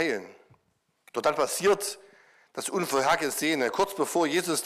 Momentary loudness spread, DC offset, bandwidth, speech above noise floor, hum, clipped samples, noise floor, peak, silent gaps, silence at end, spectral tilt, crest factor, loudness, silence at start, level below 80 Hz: 11 LU; under 0.1%; 16 kHz; 46 dB; none; under 0.1%; -73 dBFS; -12 dBFS; none; 0 s; -3 dB/octave; 16 dB; -27 LUFS; 0 s; -68 dBFS